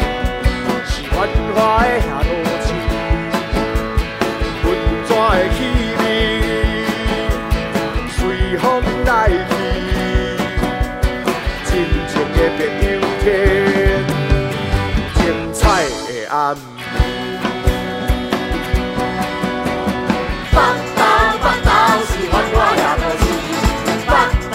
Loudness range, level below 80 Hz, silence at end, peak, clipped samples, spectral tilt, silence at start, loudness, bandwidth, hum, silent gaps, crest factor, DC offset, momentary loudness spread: 4 LU; -22 dBFS; 0 s; 0 dBFS; under 0.1%; -5.5 dB/octave; 0 s; -17 LUFS; 16 kHz; none; none; 16 dB; under 0.1%; 6 LU